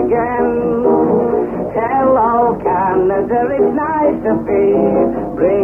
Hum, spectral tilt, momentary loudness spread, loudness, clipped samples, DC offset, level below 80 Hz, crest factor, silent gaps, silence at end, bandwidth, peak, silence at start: none; -10.5 dB/octave; 4 LU; -14 LUFS; under 0.1%; under 0.1%; -40 dBFS; 12 dB; none; 0 s; 3.2 kHz; -2 dBFS; 0 s